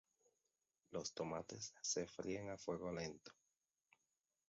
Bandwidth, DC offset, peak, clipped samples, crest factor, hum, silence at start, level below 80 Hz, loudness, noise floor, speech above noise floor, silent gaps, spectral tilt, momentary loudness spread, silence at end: 7.6 kHz; under 0.1%; -30 dBFS; under 0.1%; 20 dB; none; 0.9 s; -76 dBFS; -47 LUFS; under -90 dBFS; over 43 dB; none; -4 dB/octave; 8 LU; 1.15 s